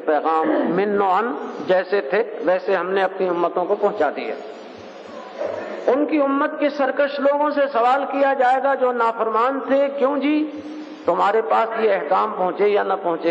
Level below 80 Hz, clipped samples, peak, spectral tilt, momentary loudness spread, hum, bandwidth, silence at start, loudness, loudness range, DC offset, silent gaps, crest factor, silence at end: -78 dBFS; under 0.1%; -6 dBFS; -6.5 dB/octave; 10 LU; none; 7.8 kHz; 0 s; -20 LUFS; 4 LU; under 0.1%; none; 14 dB; 0 s